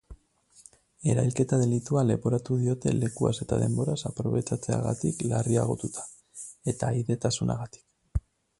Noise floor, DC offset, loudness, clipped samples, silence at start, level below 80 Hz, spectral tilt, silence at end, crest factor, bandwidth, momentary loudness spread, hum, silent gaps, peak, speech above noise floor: -61 dBFS; under 0.1%; -28 LUFS; under 0.1%; 0.1 s; -46 dBFS; -6.5 dB/octave; 0.4 s; 18 dB; 11.5 kHz; 10 LU; none; none; -10 dBFS; 34 dB